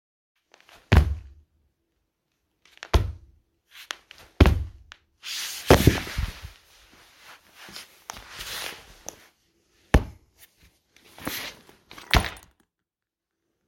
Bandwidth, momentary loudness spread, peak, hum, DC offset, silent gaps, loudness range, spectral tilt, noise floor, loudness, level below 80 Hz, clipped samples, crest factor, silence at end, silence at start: 17 kHz; 24 LU; 0 dBFS; none; under 0.1%; none; 10 LU; -5 dB/octave; -88 dBFS; -25 LUFS; -32 dBFS; under 0.1%; 28 dB; 1.3 s; 0.9 s